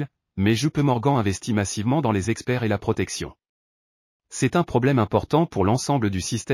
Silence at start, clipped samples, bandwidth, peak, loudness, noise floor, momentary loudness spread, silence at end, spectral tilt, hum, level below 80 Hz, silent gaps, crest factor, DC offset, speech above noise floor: 0 s; under 0.1%; 14.5 kHz; -6 dBFS; -23 LUFS; under -90 dBFS; 6 LU; 0 s; -6 dB/octave; none; -50 dBFS; 3.49-4.20 s; 16 dB; under 0.1%; over 68 dB